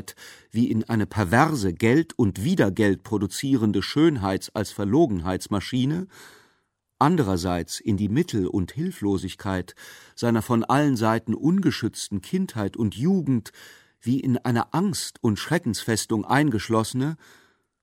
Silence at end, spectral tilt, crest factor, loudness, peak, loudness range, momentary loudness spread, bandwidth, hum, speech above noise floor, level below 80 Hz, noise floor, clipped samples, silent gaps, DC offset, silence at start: 0.65 s; -6 dB/octave; 20 dB; -24 LUFS; -4 dBFS; 3 LU; 9 LU; 16.5 kHz; none; 47 dB; -54 dBFS; -71 dBFS; under 0.1%; none; under 0.1%; 0.05 s